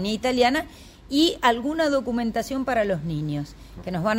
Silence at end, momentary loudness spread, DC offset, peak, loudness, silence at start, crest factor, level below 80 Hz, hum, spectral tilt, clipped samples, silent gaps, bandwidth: 0 s; 12 LU; under 0.1%; -6 dBFS; -24 LUFS; 0 s; 18 dB; -46 dBFS; none; -5 dB/octave; under 0.1%; none; 16 kHz